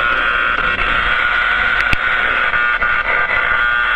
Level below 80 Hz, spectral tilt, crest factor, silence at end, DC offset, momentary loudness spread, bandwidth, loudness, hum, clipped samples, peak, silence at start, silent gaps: -32 dBFS; -3.5 dB/octave; 14 dB; 0 s; under 0.1%; 1 LU; 9.2 kHz; -14 LUFS; none; under 0.1%; 0 dBFS; 0 s; none